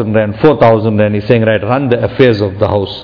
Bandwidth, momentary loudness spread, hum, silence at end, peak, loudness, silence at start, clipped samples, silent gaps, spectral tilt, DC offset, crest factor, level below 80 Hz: 5.4 kHz; 5 LU; none; 0 s; 0 dBFS; -11 LUFS; 0 s; 2%; none; -9 dB/octave; under 0.1%; 10 dB; -40 dBFS